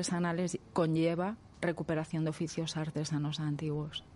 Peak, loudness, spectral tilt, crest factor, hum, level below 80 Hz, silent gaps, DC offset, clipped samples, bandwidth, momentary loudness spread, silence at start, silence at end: -16 dBFS; -34 LUFS; -5.5 dB/octave; 18 dB; none; -64 dBFS; none; under 0.1%; under 0.1%; 11.5 kHz; 6 LU; 0 s; 0 s